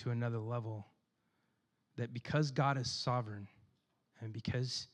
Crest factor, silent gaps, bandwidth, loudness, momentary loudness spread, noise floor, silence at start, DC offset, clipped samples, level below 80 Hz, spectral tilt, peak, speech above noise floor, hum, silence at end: 20 dB; none; 10 kHz; -38 LUFS; 16 LU; -81 dBFS; 0 s; under 0.1%; under 0.1%; -72 dBFS; -5.5 dB/octave; -20 dBFS; 43 dB; none; 0.05 s